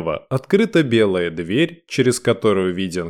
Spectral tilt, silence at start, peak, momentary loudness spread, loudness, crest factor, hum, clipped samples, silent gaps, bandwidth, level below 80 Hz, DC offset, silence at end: -5.5 dB/octave; 0 s; -2 dBFS; 6 LU; -18 LUFS; 16 dB; none; under 0.1%; none; 14.5 kHz; -54 dBFS; 0.1%; 0 s